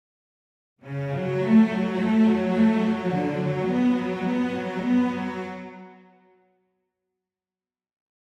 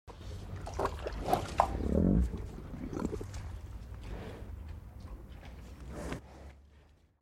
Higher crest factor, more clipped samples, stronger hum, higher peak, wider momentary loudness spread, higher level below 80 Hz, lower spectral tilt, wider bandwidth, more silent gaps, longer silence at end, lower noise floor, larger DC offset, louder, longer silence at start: second, 16 dB vs 28 dB; neither; neither; about the same, -8 dBFS vs -8 dBFS; second, 13 LU vs 19 LU; second, -66 dBFS vs -42 dBFS; about the same, -8 dB/octave vs -7 dB/octave; second, 8 kHz vs 15.5 kHz; neither; first, 2.35 s vs 0.35 s; first, under -90 dBFS vs -62 dBFS; neither; first, -23 LUFS vs -37 LUFS; first, 0.85 s vs 0.05 s